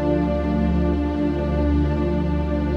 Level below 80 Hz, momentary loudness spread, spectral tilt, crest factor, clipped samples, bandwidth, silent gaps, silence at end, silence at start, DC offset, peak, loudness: -26 dBFS; 2 LU; -9.5 dB/octave; 12 dB; under 0.1%; 5.8 kHz; none; 0 s; 0 s; under 0.1%; -8 dBFS; -22 LUFS